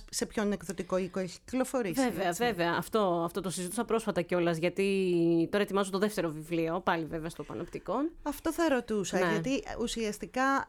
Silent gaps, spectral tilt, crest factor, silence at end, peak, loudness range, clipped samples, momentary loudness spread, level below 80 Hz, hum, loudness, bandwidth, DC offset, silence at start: none; -5 dB/octave; 16 dB; 0.05 s; -14 dBFS; 3 LU; under 0.1%; 7 LU; -56 dBFS; none; -31 LUFS; 19 kHz; under 0.1%; 0 s